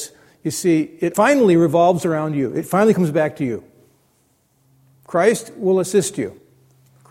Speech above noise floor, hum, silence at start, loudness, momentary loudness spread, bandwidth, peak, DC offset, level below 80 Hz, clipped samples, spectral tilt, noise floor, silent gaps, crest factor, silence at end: 44 dB; none; 0 s; -18 LUFS; 12 LU; 16.5 kHz; -2 dBFS; under 0.1%; -60 dBFS; under 0.1%; -6 dB/octave; -61 dBFS; none; 18 dB; 0.75 s